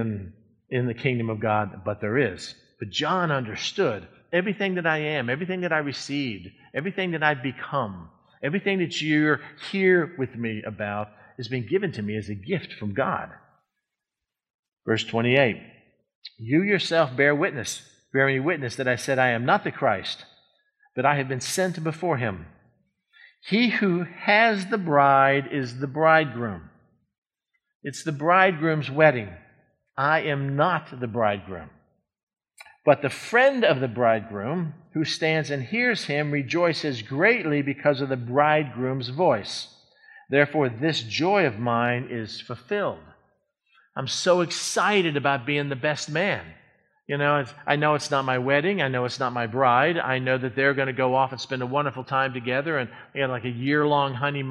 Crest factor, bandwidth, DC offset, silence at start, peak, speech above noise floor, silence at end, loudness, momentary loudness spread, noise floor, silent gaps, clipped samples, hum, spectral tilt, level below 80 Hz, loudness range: 22 dB; 13.5 kHz; under 0.1%; 0 s; -2 dBFS; 63 dB; 0 s; -24 LUFS; 12 LU; -87 dBFS; 14.50-14.63 s, 16.15-16.22 s, 27.18-27.22 s, 27.75-27.80 s, 32.23-32.27 s; under 0.1%; none; -5 dB/octave; -64 dBFS; 4 LU